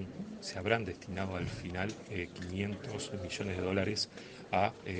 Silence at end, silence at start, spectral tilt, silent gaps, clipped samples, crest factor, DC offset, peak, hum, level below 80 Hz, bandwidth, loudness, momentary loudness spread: 0 s; 0 s; -5 dB/octave; none; under 0.1%; 24 dB; under 0.1%; -14 dBFS; none; -62 dBFS; 9.6 kHz; -37 LUFS; 8 LU